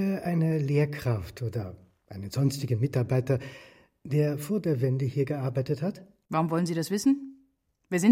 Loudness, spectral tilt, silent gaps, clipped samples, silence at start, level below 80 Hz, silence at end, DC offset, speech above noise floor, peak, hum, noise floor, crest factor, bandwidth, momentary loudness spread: -28 LUFS; -7 dB/octave; none; under 0.1%; 0 s; -60 dBFS; 0 s; under 0.1%; 42 dB; -8 dBFS; none; -69 dBFS; 18 dB; 16.5 kHz; 15 LU